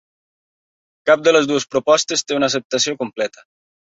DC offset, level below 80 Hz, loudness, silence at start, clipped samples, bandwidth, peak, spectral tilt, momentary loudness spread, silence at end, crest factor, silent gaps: under 0.1%; -62 dBFS; -17 LUFS; 1.05 s; under 0.1%; 8 kHz; -2 dBFS; -2.5 dB/octave; 10 LU; 0.7 s; 18 dB; 2.65-2.70 s